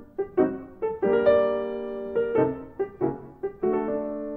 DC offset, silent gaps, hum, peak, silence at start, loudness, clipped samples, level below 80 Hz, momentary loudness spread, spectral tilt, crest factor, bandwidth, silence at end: under 0.1%; none; none; -8 dBFS; 0 s; -26 LUFS; under 0.1%; -54 dBFS; 12 LU; -10 dB/octave; 18 dB; 4.5 kHz; 0 s